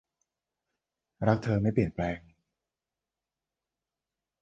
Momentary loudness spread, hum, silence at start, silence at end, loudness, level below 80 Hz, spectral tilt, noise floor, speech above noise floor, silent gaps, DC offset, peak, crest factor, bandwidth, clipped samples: 8 LU; none; 1.2 s; 2.25 s; -29 LUFS; -54 dBFS; -9 dB/octave; under -90 dBFS; over 62 dB; none; under 0.1%; -10 dBFS; 24 dB; 7.6 kHz; under 0.1%